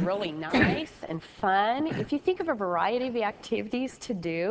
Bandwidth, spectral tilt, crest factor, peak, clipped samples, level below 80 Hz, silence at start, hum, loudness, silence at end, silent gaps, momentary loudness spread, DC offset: 8 kHz; -6 dB/octave; 20 dB; -8 dBFS; under 0.1%; -54 dBFS; 0 s; none; -28 LUFS; 0 s; none; 9 LU; under 0.1%